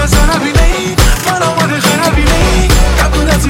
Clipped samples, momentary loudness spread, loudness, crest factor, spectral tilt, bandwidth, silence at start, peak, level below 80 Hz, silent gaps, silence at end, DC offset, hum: under 0.1%; 2 LU; -10 LUFS; 8 dB; -4.5 dB/octave; 17 kHz; 0 s; 0 dBFS; -12 dBFS; none; 0 s; under 0.1%; none